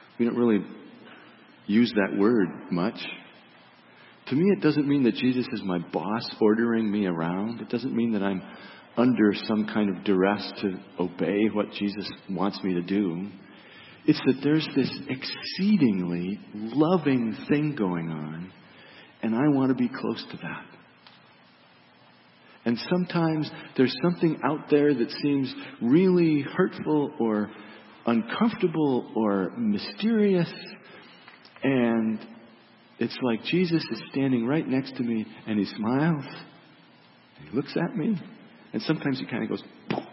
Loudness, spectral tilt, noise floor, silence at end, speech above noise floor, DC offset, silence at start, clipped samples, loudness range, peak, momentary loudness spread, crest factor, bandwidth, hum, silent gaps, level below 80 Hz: -26 LUFS; -10.5 dB/octave; -56 dBFS; 0 s; 31 dB; under 0.1%; 0.2 s; under 0.1%; 5 LU; -8 dBFS; 12 LU; 20 dB; 5.8 kHz; none; none; -70 dBFS